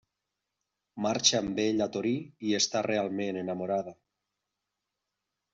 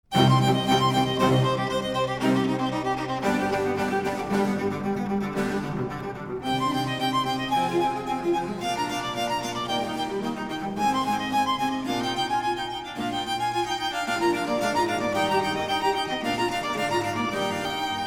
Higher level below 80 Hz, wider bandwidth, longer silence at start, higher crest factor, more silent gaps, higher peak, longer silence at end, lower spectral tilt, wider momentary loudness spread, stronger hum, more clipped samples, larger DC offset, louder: second, -68 dBFS vs -52 dBFS; second, 8 kHz vs 17.5 kHz; first, 0.95 s vs 0.1 s; first, 24 dB vs 18 dB; neither; about the same, -8 dBFS vs -6 dBFS; first, 1.6 s vs 0 s; second, -3.5 dB/octave vs -5 dB/octave; about the same, 9 LU vs 7 LU; first, 50 Hz at -55 dBFS vs none; neither; neither; second, -29 LUFS vs -25 LUFS